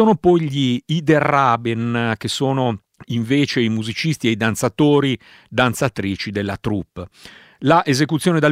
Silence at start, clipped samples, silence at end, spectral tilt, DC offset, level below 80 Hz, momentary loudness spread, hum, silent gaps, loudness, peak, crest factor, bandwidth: 0 s; under 0.1%; 0 s; -5.5 dB/octave; under 0.1%; -52 dBFS; 10 LU; none; none; -18 LUFS; 0 dBFS; 18 dB; 16 kHz